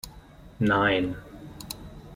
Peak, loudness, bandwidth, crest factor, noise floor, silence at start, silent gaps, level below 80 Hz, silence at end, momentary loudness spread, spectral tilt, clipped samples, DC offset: -10 dBFS; -25 LUFS; 16.5 kHz; 20 dB; -48 dBFS; 0.05 s; none; -50 dBFS; 0 s; 21 LU; -5.5 dB/octave; under 0.1%; under 0.1%